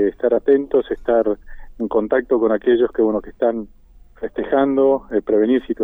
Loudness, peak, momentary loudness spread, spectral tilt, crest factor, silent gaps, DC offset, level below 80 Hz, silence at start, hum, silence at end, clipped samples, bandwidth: -18 LUFS; -4 dBFS; 12 LU; -9 dB/octave; 14 dB; none; under 0.1%; -44 dBFS; 0 s; none; 0 s; under 0.1%; 3.8 kHz